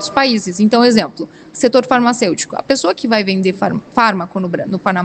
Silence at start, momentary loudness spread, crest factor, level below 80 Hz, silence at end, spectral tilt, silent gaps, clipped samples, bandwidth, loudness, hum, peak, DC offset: 0 s; 9 LU; 14 dB; -54 dBFS; 0 s; -4.5 dB/octave; none; under 0.1%; 9.2 kHz; -14 LUFS; none; 0 dBFS; under 0.1%